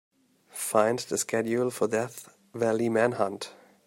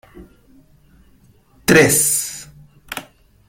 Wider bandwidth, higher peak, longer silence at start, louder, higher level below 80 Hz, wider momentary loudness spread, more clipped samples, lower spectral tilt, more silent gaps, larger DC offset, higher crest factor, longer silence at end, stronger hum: about the same, 16 kHz vs 16.5 kHz; second, -8 dBFS vs 0 dBFS; first, 0.55 s vs 0.15 s; second, -27 LUFS vs -14 LUFS; second, -74 dBFS vs -48 dBFS; second, 16 LU vs 20 LU; neither; first, -4.5 dB/octave vs -3 dB/octave; neither; neither; about the same, 20 dB vs 20 dB; about the same, 0.35 s vs 0.45 s; neither